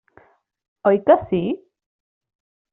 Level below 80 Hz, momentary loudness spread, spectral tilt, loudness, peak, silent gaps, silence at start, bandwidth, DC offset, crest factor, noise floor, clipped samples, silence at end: -58 dBFS; 11 LU; -6 dB/octave; -19 LUFS; -2 dBFS; none; 0.85 s; 3.9 kHz; under 0.1%; 20 dB; -55 dBFS; under 0.1%; 1.15 s